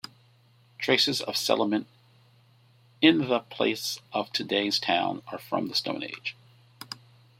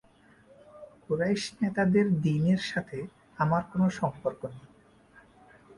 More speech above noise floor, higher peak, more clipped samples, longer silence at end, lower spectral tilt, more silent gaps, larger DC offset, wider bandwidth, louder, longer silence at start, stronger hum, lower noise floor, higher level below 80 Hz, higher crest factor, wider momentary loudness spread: about the same, 33 dB vs 31 dB; first, -4 dBFS vs -12 dBFS; neither; first, 0.45 s vs 0.05 s; second, -3.5 dB/octave vs -7 dB/octave; neither; neither; first, 16.5 kHz vs 11 kHz; about the same, -27 LUFS vs -28 LUFS; about the same, 0.8 s vs 0.75 s; neither; about the same, -60 dBFS vs -59 dBFS; second, -74 dBFS vs -62 dBFS; first, 26 dB vs 18 dB; first, 18 LU vs 15 LU